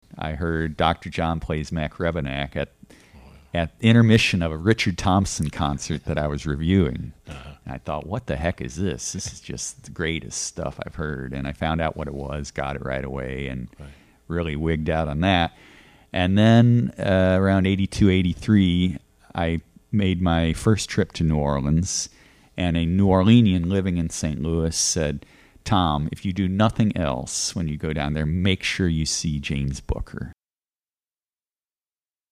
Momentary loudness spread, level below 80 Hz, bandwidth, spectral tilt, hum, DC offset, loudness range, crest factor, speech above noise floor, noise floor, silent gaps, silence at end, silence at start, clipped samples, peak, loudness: 13 LU; -38 dBFS; 13.5 kHz; -5.5 dB/octave; none; under 0.1%; 9 LU; 18 dB; over 68 dB; under -90 dBFS; none; 2 s; 0.15 s; under 0.1%; -4 dBFS; -23 LUFS